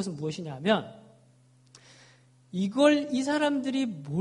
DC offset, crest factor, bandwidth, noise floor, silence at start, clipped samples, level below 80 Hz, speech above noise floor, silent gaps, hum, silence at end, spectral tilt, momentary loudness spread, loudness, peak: under 0.1%; 22 dB; 11 kHz; -60 dBFS; 0 s; under 0.1%; -72 dBFS; 33 dB; none; none; 0 s; -5.5 dB/octave; 12 LU; -27 LUFS; -8 dBFS